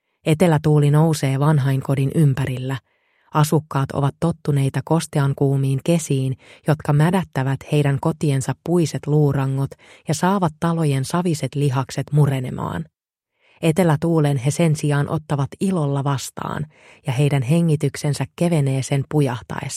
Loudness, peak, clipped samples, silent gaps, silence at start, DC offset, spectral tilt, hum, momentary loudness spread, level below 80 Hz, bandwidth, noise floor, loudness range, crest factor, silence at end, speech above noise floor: -20 LUFS; -2 dBFS; under 0.1%; none; 0.25 s; under 0.1%; -7 dB/octave; none; 9 LU; -52 dBFS; 14.5 kHz; -74 dBFS; 2 LU; 16 dB; 0 s; 55 dB